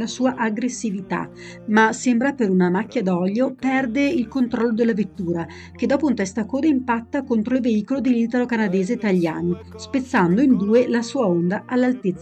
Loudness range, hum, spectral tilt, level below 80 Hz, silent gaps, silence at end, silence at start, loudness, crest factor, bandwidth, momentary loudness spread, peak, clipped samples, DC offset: 2 LU; none; -6.5 dB/octave; -56 dBFS; none; 0 s; 0 s; -21 LUFS; 14 dB; 9 kHz; 9 LU; -6 dBFS; under 0.1%; under 0.1%